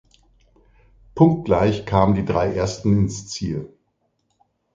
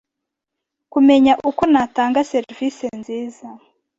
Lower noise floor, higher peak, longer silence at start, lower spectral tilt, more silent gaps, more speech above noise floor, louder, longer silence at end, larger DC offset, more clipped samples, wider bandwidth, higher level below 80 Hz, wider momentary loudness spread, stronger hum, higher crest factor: second, -70 dBFS vs -81 dBFS; first, 0 dBFS vs -4 dBFS; first, 1.15 s vs 0.95 s; first, -7 dB/octave vs -5 dB/octave; neither; second, 51 dB vs 65 dB; second, -20 LUFS vs -17 LUFS; first, 1.1 s vs 0.4 s; neither; neither; first, 9 kHz vs 7.8 kHz; first, -40 dBFS vs -54 dBFS; second, 12 LU vs 16 LU; neither; about the same, 20 dB vs 16 dB